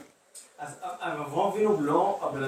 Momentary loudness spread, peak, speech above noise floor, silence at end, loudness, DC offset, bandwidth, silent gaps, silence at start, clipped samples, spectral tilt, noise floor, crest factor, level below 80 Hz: 23 LU; -10 dBFS; 25 dB; 0 s; -27 LUFS; under 0.1%; 15 kHz; none; 0 s; under 0.1%; -6 dB/octave; -52 dBFS; 18 dB; -72 dBFS